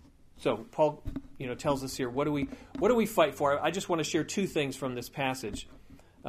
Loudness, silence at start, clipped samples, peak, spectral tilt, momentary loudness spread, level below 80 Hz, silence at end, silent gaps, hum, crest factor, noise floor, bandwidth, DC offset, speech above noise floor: -31 LUFS; 0.35 s; under 0.1%; -10 dBFS; -5 dB/octave; 13 LU; -52 dBFS; 0 s; none; none; 20 dB; -51 dBFS; 15.5 kHz; under 0.1%; 21 dB